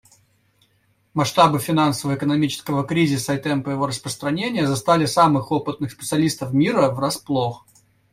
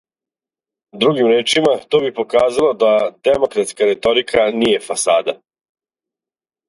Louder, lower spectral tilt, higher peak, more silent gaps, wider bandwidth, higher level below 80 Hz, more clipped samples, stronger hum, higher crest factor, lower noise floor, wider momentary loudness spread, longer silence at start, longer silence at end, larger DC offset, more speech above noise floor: second, -20 LUFS vs -15 LUFS; first, -5.5 dB/octave vs -3.5 dB/octave; about the same, -2 dBFS vs 0 dBFS; neither; first, 16 kHz vs 11.5 kHz; about the same, -56 dBFS vs -54 dBFS; neither; neither; about the same, 18 dB vs 16 dB; second, -63 dBFS vs under -90 dBFS; first, 8 LU vs 4 LU; first, 1.15 s vs 0.95 s; second, 0.55 s vs 1.35 s; neither; second, 43 dB vs over 75 dB